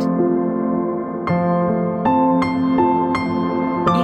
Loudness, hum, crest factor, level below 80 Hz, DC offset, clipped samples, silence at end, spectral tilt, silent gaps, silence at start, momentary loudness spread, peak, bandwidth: -18 LUFS; none; 16 dB; -48 dBFS; under 0.1%; under 0.1%; 0 s; -8.5 dB/octave; none; 0 s; 4 LU; -2 dBFS; 8.2 kHz